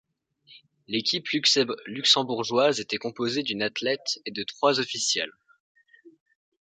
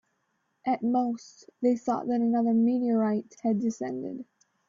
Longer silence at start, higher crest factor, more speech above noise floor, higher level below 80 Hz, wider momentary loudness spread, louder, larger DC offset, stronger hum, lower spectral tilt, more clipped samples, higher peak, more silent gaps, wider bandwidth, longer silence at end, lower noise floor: second, 0.5 s vs 0.65 s; first, 20 dB vs 14 dB; second, 32 dB vs 49 dB; about the same, -74 dBFS vs -74 dBFS; about the same, 10 LU vs 11 LU; first, -25 LUFS vs -28 LUFS; neither; neither; second, -2.5 dB/octave vs -7.5 dB/octave; neither; first, -6 dBFS vs -14 dBFS; first, 5.60-5.75 s vs none; first, 9.6 kHz vs 7.6 kHz; first, 0.6 s vs 0.45 s; second, -58 dBFS vs -76 dBFS